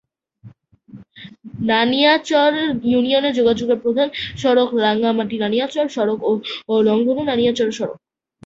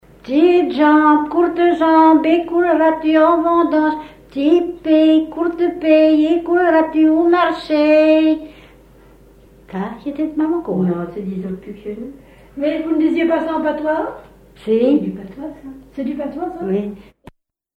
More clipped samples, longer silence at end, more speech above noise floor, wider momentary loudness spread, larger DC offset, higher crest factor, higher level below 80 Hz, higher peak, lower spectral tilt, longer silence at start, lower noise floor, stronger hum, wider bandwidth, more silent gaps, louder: neither; second, 0.5 s vs 0.8 s; about the same, 28 dB vs 31 dB; second, 7 LU vs 17 LU; neither; about the same, 16 dB vs 14 dB; about the same, -54 dBFS vs -50 dBFS; about the same, -2 dBFS vs -2 dBFS; second, -5 dB/octave vs -8 dB/octave; first, 0.45 s vs 0.25 s; about the same, -45 dBFS vs -46 dBFS; neither; first, 7.8 kHz vs 5.2 kHz; neither; second, -18 LUFS vs -15 LUFS